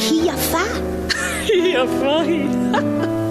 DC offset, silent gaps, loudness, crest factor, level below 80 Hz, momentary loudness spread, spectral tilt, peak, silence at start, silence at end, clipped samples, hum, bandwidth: under 0.1%; none; -18 LUFS; 14 dB; -38 dBFS; 4 LU; -4 dB/octave; -4 dBFS; 0 s; 0 s; under 0.1%; none; 13.5 kHz